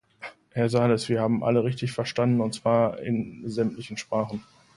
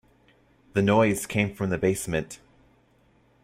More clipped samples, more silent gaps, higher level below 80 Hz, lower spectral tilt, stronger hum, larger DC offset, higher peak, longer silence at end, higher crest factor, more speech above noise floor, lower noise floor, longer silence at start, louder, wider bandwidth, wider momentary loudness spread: neither; neither; second, -60 dBFS vs -54 dBFS; about the same, -6.5 dB/octave vs -5.5 dB/octave; neither; neither; about the same, -8 dBFS vs -8 dBFS; second, 0.35 s vs 1.1 s; about the same, 18 dB vs 18 dB; second, 20 dB vs 38 dB; second, -45 dBFS vs -62 dBFS; second, 0.2 s vs 0.75 s; about the same, -26 LUFS vs -25 LUFS; second, 11.5 kHz vs 16 kHz; about the same, 11 LU vs 11 LU